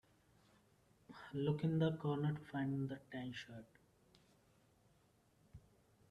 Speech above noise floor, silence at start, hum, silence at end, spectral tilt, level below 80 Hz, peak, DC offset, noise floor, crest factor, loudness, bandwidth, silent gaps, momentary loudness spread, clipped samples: 33 dB; 1.1 s; none; 0.5 s; -8 dB/octave; -74 dBFS; -26 dBFS; under 0.1%; -74 dBFS; 20 dB; -42 LUFS; 7.4 kHz; none; 19 LU; under 0.1%